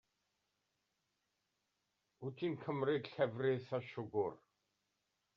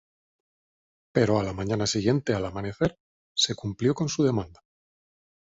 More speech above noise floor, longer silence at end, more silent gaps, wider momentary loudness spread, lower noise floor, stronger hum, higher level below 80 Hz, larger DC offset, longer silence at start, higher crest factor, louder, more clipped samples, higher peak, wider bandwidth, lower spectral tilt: second, 47 dB vs over 64 dB; about the same, 1 s vs 0.9 s; second, none vs 3.00-3.35 s; about the same, 7 LU vs 7 LU; second, -86 dBFS vs under -90 dBFS; neither; second, -84 dBFS vs -52 dBFS; neither; first, 2.2 s vs 1.15 s; about the same, 20 dB vs 22 dB; second, -40 LUFS vs -26 LUFS; neither; second, -22 dBFS vs -6 dBFS; second, 6.4 kHz vs 8 kHz; about the same, -5.5 dB/octave vs -5 dB/octave